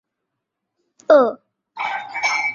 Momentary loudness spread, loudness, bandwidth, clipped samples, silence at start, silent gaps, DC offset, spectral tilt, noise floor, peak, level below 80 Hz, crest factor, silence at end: 13 LU; -18 LUFS; 7.4 kHz; under 0.1%; 1.1 s; none; under 0.1%; -2.5 dB/octave; -79 dBFS; -2 dBFS; -72 dBFS; 20 dB; 0 s